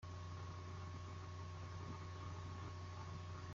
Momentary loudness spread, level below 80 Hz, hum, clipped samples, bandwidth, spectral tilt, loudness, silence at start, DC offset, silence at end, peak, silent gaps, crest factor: 1 LU; -68 dBFS; none; under 0.1%; 7.6 kHz; -5.5 dB/octave; -51 LUFS; 0 s; under 0.1%; 0 s; -38 dBFS; none; 12 dB